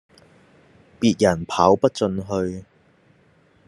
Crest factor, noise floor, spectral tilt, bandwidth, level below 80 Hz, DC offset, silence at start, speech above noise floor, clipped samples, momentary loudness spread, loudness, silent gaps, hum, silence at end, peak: 22 dB; -57 dBFS; -6 dB/octave; 12 kHz; -58 dBFS; under 0.1%; 1 s; 38 dB; under 0.1%; 10 LU; -20 LUFS; none; none; 1.05 s; -2 dBFS